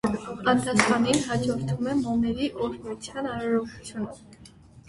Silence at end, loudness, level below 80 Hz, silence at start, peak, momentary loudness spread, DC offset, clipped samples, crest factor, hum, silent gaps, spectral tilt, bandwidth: 0.1 s; -26 LUFS; -52 dBFS; 0.05 s; 0 dBFS; 14 LU; under 0.1%; under 0.1%; 26 dB; none; none; -5 dB/octave; 11.5 kHz